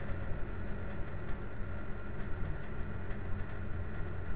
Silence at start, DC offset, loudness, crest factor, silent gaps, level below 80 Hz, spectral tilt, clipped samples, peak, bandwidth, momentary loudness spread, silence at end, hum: 0 s; 1%; -43 LUFS; 12 dB; none; -44 dBFS; -10.5 dB/octave; under 0.1%; -22 dBFS; 4 kHz; 2 LU; 0 s; none